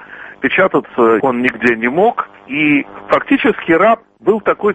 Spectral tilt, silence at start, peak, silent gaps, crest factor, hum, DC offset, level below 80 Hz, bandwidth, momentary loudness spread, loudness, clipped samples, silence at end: -7 dB/octave; 0 s; 0 dBFS; none; 14 dB; none; under 0.1%; -52 dBFS; 8.2 kHz; 5 LU; -14 LUFS; under 0.1%; 0 s